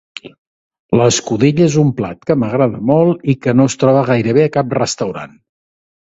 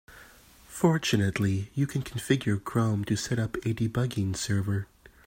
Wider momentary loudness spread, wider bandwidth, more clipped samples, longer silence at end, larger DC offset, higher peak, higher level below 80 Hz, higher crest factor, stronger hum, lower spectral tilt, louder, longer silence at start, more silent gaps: first, 10 LU vs 6 LU; second, 8 kHz vs 16.5 kHz; neither; first, 0.85 s vs 0.4 s; neither; first, 0 dBFS vs -8 dBFS; about the same, -50 dBFS vs -54 dBFS; second, 14 dB vs 20 dB; neither; about the same, -6 dB/octave vs -5.5 dB/octave; first, -14 LUFS vs -28 LUFS; first, 0.25 s vs 0.1 s; first, 0.38-0.71 s, 0.79-0.89 s vs none